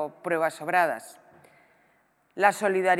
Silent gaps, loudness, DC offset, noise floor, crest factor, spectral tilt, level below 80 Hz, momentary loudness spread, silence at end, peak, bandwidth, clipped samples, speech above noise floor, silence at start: none; -25 LUFS; under 0.1%; -66 dBFS; 22 dB; -4.5 dB/octave; -84 dBFS; 17 LU; 0 s; -6 dBFS; 16 kHz; under 0.1%; 41 dB; 0 s